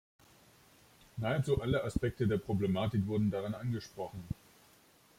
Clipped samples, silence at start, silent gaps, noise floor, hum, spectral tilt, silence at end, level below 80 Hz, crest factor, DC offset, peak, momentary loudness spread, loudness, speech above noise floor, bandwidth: under 0.1%; 1.15 s; none; -64 dBFS; none; -7.5 dB/octave; 0.85 s; -54 dBFS; 18 dB; under 0.1%; -16 dBFS; 12 LU; -35 LUFS; 31 dB; 16 kHz